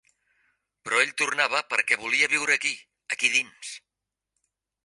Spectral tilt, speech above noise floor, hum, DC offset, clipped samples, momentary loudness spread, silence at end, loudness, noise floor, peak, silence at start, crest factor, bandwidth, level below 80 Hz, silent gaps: 0 dB/octave; 61 dB; none; under 0.1%; under 0.1%; 17 LU; 1.05 s; -23 LUFS; -87 dBFS; -6 dBFS; 0.85 s; 22 dB; 11.5 kHz; -78 dBFS; none